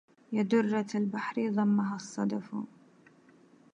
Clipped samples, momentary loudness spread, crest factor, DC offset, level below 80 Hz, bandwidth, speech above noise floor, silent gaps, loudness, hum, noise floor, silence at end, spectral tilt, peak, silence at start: under 0.1%; 11 LU; 16 dB; under 0.1%; -82 dBFS; 9.4 kHz; 30 dB; none; -31 LUFS; none; -60 dBFS; 1.05 s; -7 dB/octave; -16 dBFS; 0.3 s